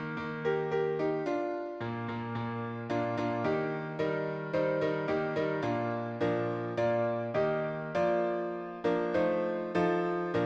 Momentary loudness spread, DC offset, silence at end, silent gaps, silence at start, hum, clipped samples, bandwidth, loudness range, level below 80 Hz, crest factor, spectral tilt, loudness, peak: 6 LU; under 0.1%; 0 s; none; 0 s; none; under 0.1%; 8 kHz; 3 LU; -66 dBFS; 14 dB; -8 dB/octave; -32 LUFS; -18 dBFS